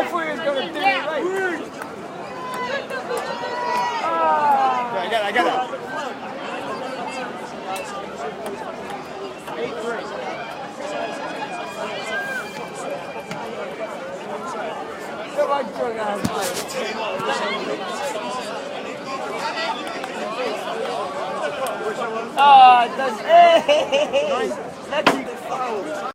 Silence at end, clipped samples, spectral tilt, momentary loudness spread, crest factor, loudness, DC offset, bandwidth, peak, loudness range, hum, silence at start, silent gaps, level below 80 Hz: 0 s; under 0.1%; -3.5 dB/octave; 13 LU; 20 dB; -22 LUFS; under 0.1%; 16 kHz; -2 dBFS; 14 LU; none; 0 s; none; -62 dBFS